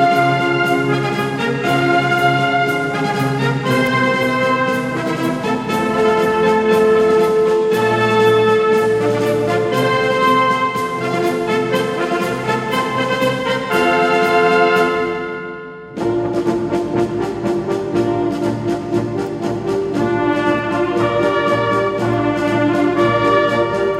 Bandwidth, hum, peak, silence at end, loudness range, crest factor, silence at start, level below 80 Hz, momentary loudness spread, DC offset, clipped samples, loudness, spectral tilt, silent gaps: 16 kHz; none; -2 dBFS; 0 s; 5 LU; 14 dB; 0 s; -48 dBFS; 6 LU; under 0.1%; under 0.1%; -16 LUFS; -6 dB/octave; none